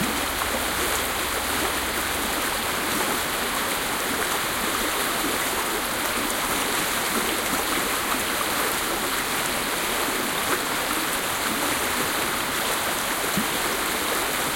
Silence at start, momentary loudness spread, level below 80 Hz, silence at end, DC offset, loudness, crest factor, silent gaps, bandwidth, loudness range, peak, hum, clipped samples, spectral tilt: 0 s; 1 LU; -46 dBFS; 0 s; under 0.1%; -23 LUFS; 18 dB; none; 17 kHz; 1 LU; -8 dBFS; none; under 0.1%; -1.5 dB/octave